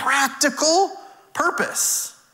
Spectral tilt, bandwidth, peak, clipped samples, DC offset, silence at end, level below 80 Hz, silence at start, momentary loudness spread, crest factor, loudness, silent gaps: -0.5 dB/octave; 16.5 kHz; -6 dBFS; under 0.1%; under 0.1%; 0.25 s; -68 dBFS; 0 s; 6 LU; 16 dB; -20 LUFS; none